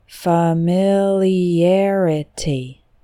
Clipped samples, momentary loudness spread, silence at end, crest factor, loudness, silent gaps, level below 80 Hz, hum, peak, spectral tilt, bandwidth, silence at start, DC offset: under 0.1%; 8 LU; 0.3 s; 14 dB; -17 LUFS; none; -46 dBFS; none; -4 dBFS; -7 dB/octave; 15 kHz; 0.1 s; under 0.1%